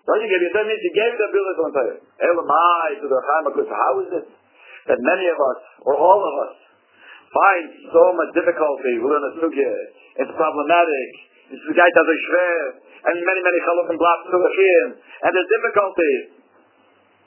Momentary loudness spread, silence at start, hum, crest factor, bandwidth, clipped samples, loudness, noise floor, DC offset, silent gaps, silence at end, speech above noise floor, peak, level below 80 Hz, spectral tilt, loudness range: 10 LU; 0.05 s; none; 18 dB; 3.2 kHz; under 0.1%; -18 LUFS; -56 dBFS; under 0.1%; none; 1 s; 38 dB; 0 dBFS; -70 dBFS; -7.5 dB/octave; 3 LU